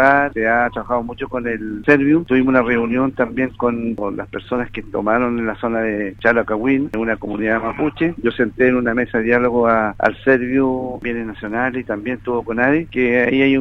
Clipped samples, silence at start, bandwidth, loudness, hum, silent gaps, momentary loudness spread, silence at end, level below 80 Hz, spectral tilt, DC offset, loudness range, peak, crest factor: under 0.1%; 0 s; 6 kHz; -18 LUFS; none; none; 9 LU; 0 s; -42 dBFS; -8 dB/octave; under 0.1%; 3 LU; 0 dBFS; 18 dB